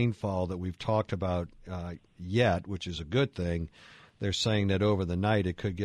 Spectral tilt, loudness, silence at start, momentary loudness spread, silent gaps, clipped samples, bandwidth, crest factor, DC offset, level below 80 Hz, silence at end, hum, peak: -6 dB/octave; -30 LUFS; 0 s; 12 LU; none; under 0.1%; 10.5 kHz; 16 dB; under 0.1%; -50 dBFS; 0 s; none; -14 dBFS